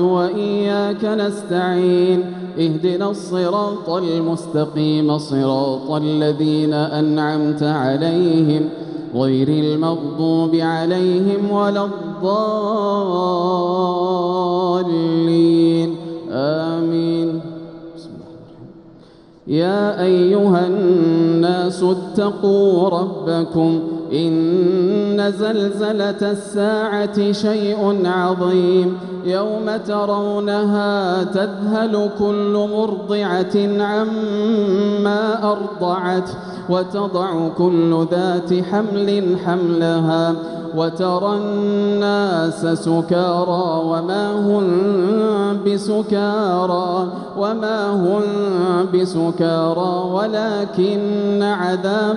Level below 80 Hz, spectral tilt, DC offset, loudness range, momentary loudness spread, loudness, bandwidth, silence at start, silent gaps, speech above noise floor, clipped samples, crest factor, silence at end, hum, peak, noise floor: -60 dBFS; -7.5 dB/octave; under 0.1%; 2 LU; 6 LU; -18 LUFS; 11 kHz; 0 s; none; 28 dB; under 0.1%; 14 dB; 0 s; none; -4 dBFS; -45 dBFS